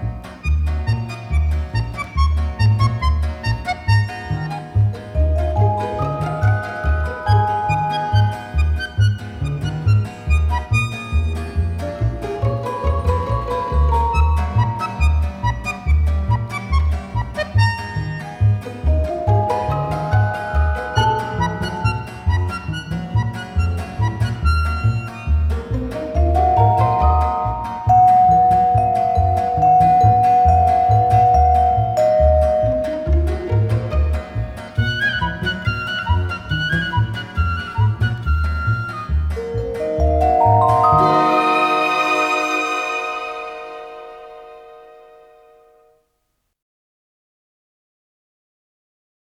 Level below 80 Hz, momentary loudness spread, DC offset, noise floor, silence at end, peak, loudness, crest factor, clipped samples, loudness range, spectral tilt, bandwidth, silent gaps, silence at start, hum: -24 dBFS; 10 LU; under 0.1%; -71 dBFS; 4.45 s; -2 dBFS; -18 LUFS; 16 dB; under 0.1%; 7 LU; -7 dB/octave; 11 kHz; none; 0 s; none